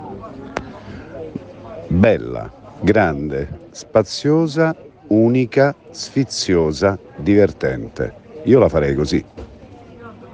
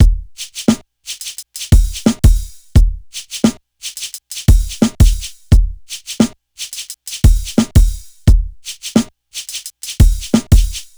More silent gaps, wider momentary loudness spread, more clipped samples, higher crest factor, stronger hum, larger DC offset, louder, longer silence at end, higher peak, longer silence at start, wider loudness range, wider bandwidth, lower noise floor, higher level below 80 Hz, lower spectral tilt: neither; first, 20 LU vs 13 LU; neither; about the same, 18 dB vs 14 dB; neither; neither; about the same, -17 LUFS vs -16 LUFS; second, 0 s vs 0.15 s; about the same, 0 dBFS vs 0 dBFS; about the same, 0 s vs 0 s; about the same, 3 LU vs 1 LU; second, 9.6 kHz vs over 20 kHz; first, -40 dBFS vs -31 dBFS; second, -42 dBFS vs -16 dBFS; about the same, -6.5 dB/octave vs -5.5 dB/octave